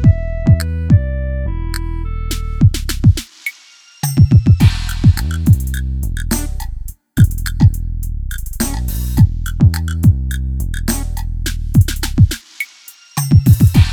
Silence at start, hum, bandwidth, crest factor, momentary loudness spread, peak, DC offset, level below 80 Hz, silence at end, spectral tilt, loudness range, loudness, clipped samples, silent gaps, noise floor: 0 s; none; 19.5 kHz; 14 dB; 14 LU; 0 dBFS; under 0.1%; -20 dBFS; 0 s; -6 dB/octave; 4 LU; -15 LUFS; under 0.1%; none; -44 dBFS